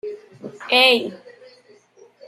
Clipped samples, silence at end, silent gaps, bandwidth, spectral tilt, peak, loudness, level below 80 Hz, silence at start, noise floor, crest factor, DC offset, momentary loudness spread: under 0.1%; 1.1 s; none; 15.5 kHz; -2.5 dB/octave; 0 dBFS; -15 LUFS; -76 dBFS; 0.05 s; -52 dBFS; 22 dB; under 0.1%; 23 LU